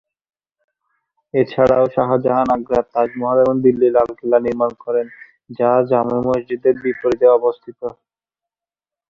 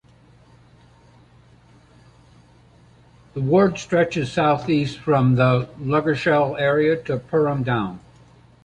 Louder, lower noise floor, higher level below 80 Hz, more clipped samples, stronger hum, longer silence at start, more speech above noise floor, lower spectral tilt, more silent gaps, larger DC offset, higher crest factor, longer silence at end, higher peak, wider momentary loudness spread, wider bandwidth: first, -17 LUFS vs -20 LUFS; first, under -90 dBFS vs -52 dBFS; about the same, -52 dBFS vs -54 dBFS; neither; neither; second, 1.35 s vs 3.35 s; first, over 74 dB vs 32 dB; about the same, -8.5 dB/octave vs -7.5 dB/octave; neither; neither; about the same, 16 dB vs 18 dB; first, 1.2 s vs 0.65 s; about the same, -2 dBFS vs -4 dBFS; about the same, 9 LU vs 7 LU; second, 6.8 kHz vs 9.4 kHz